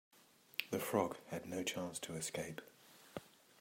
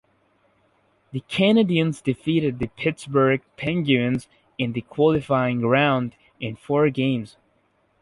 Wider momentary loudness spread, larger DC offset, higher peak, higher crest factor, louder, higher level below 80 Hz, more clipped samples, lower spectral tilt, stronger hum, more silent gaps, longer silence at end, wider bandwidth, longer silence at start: about the same, 15 LU vs 14 LU; neither; second, -16 dBFS vs -4 dBFS; first, 28 dB vs 18 dB; second, -42 LUFS vs -22 LUFS; second, -80 dBFS vs -54 dBFS; neither; second, -3.5 dB/octave vs -7 dB/octave; neither; neither; second, 0.35 s vs 0.75 s; first, 16 kHz vs 11.5 kHz; second, 0.15 s vs 1.15 s